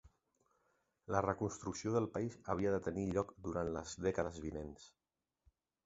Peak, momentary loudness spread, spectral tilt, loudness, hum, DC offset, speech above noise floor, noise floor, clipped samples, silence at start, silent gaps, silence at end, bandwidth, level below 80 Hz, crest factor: -18 dBFS; 9 LU; -6.5 dB/octave; -40 LUFS; none; under 0.1%; 41 dB; -80 dBFS; under 0.1%; 0.05 s; none; 1 s; 8 kHz; -60 dBFS; 24 dB